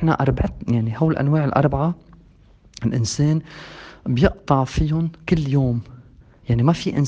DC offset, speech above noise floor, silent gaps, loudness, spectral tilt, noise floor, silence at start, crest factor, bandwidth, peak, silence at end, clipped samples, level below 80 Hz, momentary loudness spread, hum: under 0.1%; 31 dB; none; -20 LUFS; -7 dB/octave; -50 dBFS; 0 s; 20 dB; 9 kHz; 0 dBFS; 0 s; under 0.1%; -36 dBFS; 11 LU; none